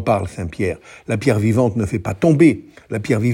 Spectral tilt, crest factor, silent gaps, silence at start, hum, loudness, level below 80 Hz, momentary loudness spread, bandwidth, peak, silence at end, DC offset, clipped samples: -7.5 dB/octave; 16 dB; none; 0 s; none; -18 LUFS; -46 dBFS; 14 LU; 16 kHz; -2 dBFS; 0 s; under 0.1%; under 0.1%